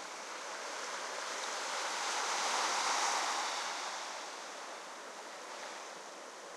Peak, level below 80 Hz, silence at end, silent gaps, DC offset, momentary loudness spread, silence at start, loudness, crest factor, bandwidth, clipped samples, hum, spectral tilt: -22 dBFS; under -90 dBFS; 0 s; none; under 0.1%; 14 LU; 0 s; -37 LUFS; 18 dB; 15.5 kHz; under 0.1%; none; 1.5 dB/octave